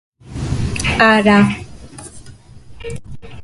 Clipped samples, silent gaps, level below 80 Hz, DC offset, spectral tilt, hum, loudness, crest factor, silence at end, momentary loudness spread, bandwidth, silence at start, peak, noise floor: under 0.1%; none; -34 dBFS; under 0.1%; -5.5 dB/octave; none; -14 LUFS; 18 dB; 0 s; 24 LU; 11.5 kHz; 0.25 s; 0 dBFS; -38 dBFS